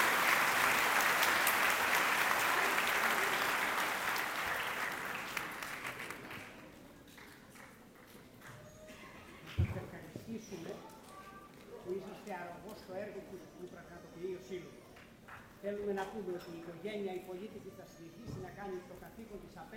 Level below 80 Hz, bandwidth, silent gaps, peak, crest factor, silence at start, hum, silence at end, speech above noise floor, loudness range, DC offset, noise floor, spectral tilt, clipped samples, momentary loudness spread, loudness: -62 dBFS; 17 kHz; none; -12 dBFS; 26 dB; 0 s; none; 0 s; 12 dB; 17 LU; under 0.1%; -57 dBFS; -2.5 dB/octave; under 0.1%; 24 LU; -34 LUFS